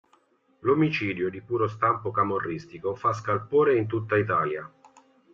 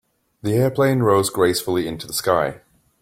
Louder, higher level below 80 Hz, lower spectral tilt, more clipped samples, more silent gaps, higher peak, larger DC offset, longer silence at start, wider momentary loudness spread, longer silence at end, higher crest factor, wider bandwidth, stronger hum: second, -26 LUFS vs -20 LUFS; second, -64 dBFS vs -54 dBFS; first, -7.5 dB/octave vs -5 dB/octave; neither; neither; second, -10 dBFS vs -2 dBFS; neither; first, 0.65 s vs 0.45 s; first, 10 LU vs 7 LU; first, 0.65 s vs 0.45 s; about the same, 16 dB vs 18 dB; second, 7.4 kHz vs 16.5 kHz; neither